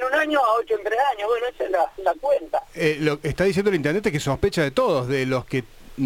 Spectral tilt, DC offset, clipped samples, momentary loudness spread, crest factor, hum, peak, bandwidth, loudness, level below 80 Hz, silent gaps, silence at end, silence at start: -5.5 dB/octave; under 0.1%; under 0.1%; 4 LU; 16 dB; none; -6 dBFS; 17 kHz; -22 LUFS; -46 dBFS; none; 0 s; 0 s